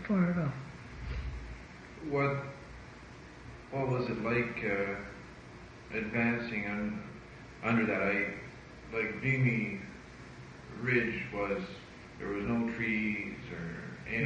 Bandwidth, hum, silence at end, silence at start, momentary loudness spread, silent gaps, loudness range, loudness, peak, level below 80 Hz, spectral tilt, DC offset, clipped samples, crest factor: 9 kHz; none; 0 s; 0 s; 20 LU; none; 4 LU; -34 LUFS; -18 dBFS; -52 dBFS; -7.5 dB/octave; under 0.1%; under 0.1%; 18 dB